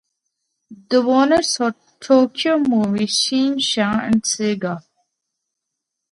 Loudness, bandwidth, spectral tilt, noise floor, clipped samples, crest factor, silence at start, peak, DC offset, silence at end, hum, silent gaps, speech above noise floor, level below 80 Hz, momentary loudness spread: -18 LUFS; 11.5 kHz; -3.5 dB/octave; -80 dBFS; under 0.1%; 18 dB; 0.7 s; -2 dBFS; under 0.1%; 1.3 s; none; none; 63 dB; -56 dBFS; 8 LU